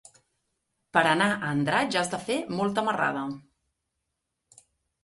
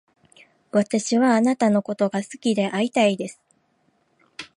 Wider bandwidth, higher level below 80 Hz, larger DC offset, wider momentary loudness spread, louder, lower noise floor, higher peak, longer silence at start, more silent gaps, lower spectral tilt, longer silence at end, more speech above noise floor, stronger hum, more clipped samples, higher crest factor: about the same, 11.5 kHz vs 11 kHz; about the same, -68 dBFS vs -72 dBFS; neither; second, 8 LU vs 12 LU; second, -26 LUFS vs -21 LUFS; first, -82 dBFS vs -66 dBFS; about the same, -6 dBFS vs -6 dBFS; first, 0.95 s vs 0.75 s; neither; about the same, -4.5 dB/octave vs -5 dB/octave; first, 1.65 s vs 0.1 s; first, 56 dB vs 45 dB; neither; neither; first, 24 dB vs 18 dB